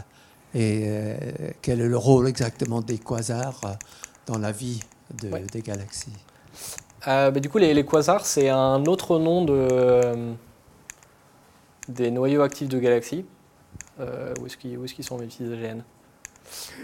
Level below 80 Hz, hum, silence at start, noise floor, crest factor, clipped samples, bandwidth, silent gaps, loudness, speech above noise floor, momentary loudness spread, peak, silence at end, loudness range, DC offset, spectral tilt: -56 dBFS; none; 0 s; -55 dBFS; 22 dB; under 0.1%; 17 kHz; none; -24 LUFS; 32 dB; 20 LU; -2 dBFS; 0 s; 12 LU; under 0.1%; -6 dB/octave